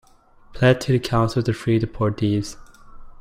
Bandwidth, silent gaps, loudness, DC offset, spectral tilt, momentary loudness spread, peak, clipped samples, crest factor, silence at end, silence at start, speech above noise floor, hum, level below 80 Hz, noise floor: 14 kHz; none; -21 LUFS; under 0.1%; -6.5 dB/octave; 5 LU; -4 dBFS; under 0.1%; 18 dB; 0.1 s; 0.5 s; 30 dB; none; -44 dBFS; -50 dBFS